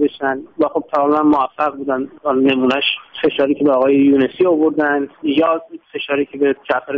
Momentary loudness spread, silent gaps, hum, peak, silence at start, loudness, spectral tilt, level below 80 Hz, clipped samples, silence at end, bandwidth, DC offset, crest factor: 8 LU; none; none; -2 dBFS; 0 s; -16 LUFS; -3 dB/octave; -58 dBFS; under 0.1%; 0 s; 5 kHz; under 0.1%; 14 dB